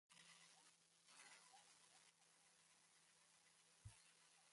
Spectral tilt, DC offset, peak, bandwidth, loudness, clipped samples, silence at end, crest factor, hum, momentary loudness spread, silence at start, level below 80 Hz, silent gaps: -1.5 dB/octave; under 0.1%; -50 dBFS; 11.5 kHz; -67 LUFS; under 0.1%; 0 s; 22 dB; none; 4 LU; 0.1 s; -86 dBFS; none